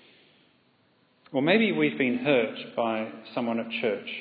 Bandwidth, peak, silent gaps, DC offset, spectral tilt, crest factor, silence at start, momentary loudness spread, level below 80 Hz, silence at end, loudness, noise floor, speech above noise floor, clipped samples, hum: 5 kHz; -8 dBFS; none; under 0.1%; -9 dB/octave; 20 dB; 1.3 s; 10 LU; -82 dBFS; 0 s; -26 LUFS; -65 dBFS; 39 dB; under 0.1%; none